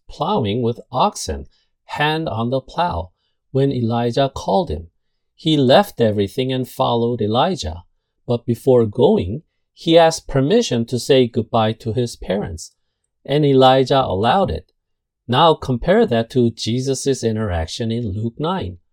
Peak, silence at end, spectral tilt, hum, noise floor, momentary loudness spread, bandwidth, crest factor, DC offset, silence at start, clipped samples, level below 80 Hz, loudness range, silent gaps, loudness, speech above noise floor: 0 dBFS; 0.15 s; -6 dB/octave; none; -73 dBFS; 13 LU; 18 kHz; 18 dB; under 0.1%; 0.1 s; under 0.1%; -42 dBFS; 5 LU; none; -18 LUFS; 56 dB